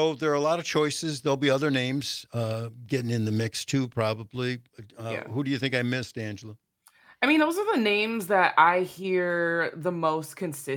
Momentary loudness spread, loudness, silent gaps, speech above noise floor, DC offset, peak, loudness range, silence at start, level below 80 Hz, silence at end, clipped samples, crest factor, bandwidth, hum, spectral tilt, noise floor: 12 LU; -26 LUFS; none; 32 dB; under 0.1%; -6 dBFS; 6 LU; 0 s; -70 dBFS; 0 s; under 0.1%; 20 dB; 19 kHz; none; -5 dB/octave; -59 dBFS